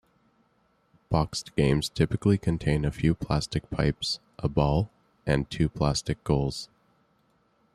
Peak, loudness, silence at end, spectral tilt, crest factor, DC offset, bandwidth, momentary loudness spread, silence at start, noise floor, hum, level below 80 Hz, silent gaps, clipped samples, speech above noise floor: -8 dBFS; -27 LUFS; 1.1 s; -6 dB/octave; 20 dB; under 0.1%; 13 kHz; 6 LU; 1.1 s; -68 dBFS; none; -42 dBFS; none; under 0.1%; 42 dB